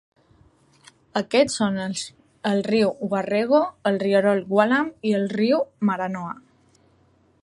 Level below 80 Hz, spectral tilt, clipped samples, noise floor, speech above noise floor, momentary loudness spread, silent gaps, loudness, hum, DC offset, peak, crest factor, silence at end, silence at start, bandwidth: -64 dBFS; -5.5 dB/octave; under 0.1%; -60 dBFS; 38 dB; 10 LU; none; -22 LUFS; none; under 0.1%; -2 dBFS; 20 dB; 1.05 s; 1.15 s; 11.5 kHz